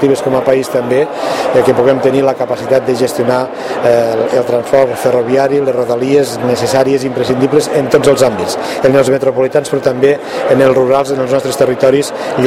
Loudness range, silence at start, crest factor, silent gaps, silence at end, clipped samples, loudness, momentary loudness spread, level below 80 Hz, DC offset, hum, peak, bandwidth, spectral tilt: 1 LU; 0 s; 10 dB; none; 0 s; 0.3%; -12 LUFS; 4 LU; -48 dBFS; under 0.1%; none; 0 dBFS; 16 kHz; -5.5 dB/octave